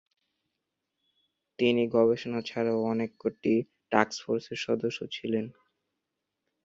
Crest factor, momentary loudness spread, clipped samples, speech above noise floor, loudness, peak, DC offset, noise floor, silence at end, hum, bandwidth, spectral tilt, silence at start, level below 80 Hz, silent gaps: 26 dB; 9 LU; under 0.1%; 57 dB; -29 LUFS; -4 dBFS; under 0.1%; -85 dBFS; 1.15 s; none; 7.8 kHz; -5.5 dB/octave; 1.6 s; -72 dBFS; none